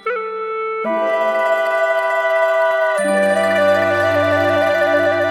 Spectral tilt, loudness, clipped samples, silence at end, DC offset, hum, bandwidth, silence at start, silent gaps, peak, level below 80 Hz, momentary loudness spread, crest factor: -4.5 dB/octave; -16 LUFS; under 0.1%; 0 s; under 0.1%; none; 14 kHz; 0.05 s; none; -4 dBFS; -66 dBFS; 7 LU; 12 dB